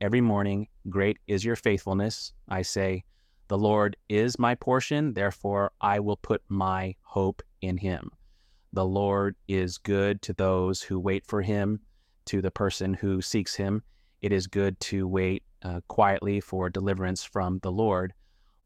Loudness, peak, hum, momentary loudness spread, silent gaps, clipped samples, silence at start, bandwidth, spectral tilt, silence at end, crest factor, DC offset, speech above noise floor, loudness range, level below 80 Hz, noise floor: -28 LUFS; -8 dBFS; none; 8 LU; none; under 0.1%; 0 s; 14 kHz; -6 dB/octave; 0.55 s; 18 dB; under 0.1%; 33 dB; 3 LU; -54 dBFS; -60 dBFS